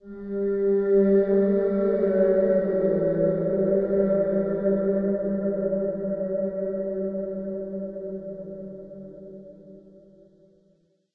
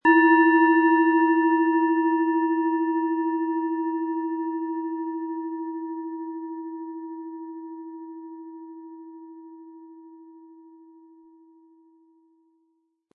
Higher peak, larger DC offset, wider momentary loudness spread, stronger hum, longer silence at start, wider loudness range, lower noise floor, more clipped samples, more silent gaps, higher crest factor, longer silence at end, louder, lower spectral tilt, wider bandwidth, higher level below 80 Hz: second, -10 dBFS vs -6 dBFS; neither; second, 17 LU vs 24 LU; neither; about the same, 0.05 s vs 0.05 s; second, 15 LU vs 23 LU; second, -65 dBFS vs -71 dBFS; neither; neither; about the same, 14 dB vs 18 dB; second, 1.35 s vs 2.7 s; about the same, -24 LUFS vs -23 LUFS; first, -12.5 dB/octave vs -7 dB/octave; second, 3.7 kHz vs 4.1 kHz; first, -54 dBFS vs -82 dBFS